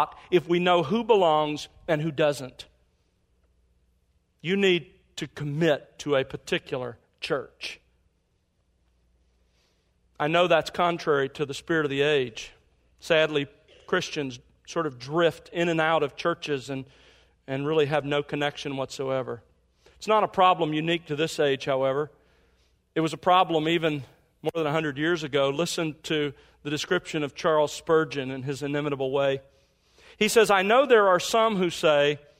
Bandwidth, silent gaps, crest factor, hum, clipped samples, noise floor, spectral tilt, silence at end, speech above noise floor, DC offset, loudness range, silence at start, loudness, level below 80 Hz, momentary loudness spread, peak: 16 kHz; none; 20 dB; none; under 0.1%; -71 dBFS; -5 dB/octave; 0.2 s; 46 dB; under 0.1%; 5 LU; 0 s; -25 LUFS; -62 dBFS; 14 LU; -6 dBFS